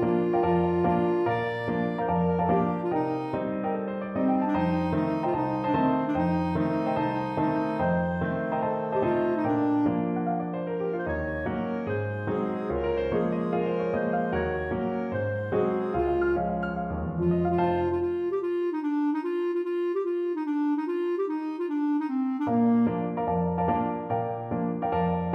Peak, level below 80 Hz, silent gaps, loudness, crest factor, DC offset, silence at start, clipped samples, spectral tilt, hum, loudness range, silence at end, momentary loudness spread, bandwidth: -12 dBFS; -48 dBFS; none; -27 LUFS; 14 dB; under 0.1%; 0 s; under 0.1%; -9.5 dB/octave; none; 2 LU; 0 s; 5 LU; 6 kHz